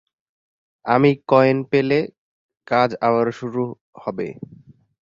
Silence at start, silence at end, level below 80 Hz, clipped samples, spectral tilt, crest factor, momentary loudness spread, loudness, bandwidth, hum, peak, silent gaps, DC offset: 0.85 s; 0.5 s; -60 dBFS; under 0.1%; -8 dB/octave; 18 dB; 16 LU; -19 LUFS; 7.2 kHz; none; -2 dBFS; 2.18-2.49 s, 3.81-3.93 s; under 0.1%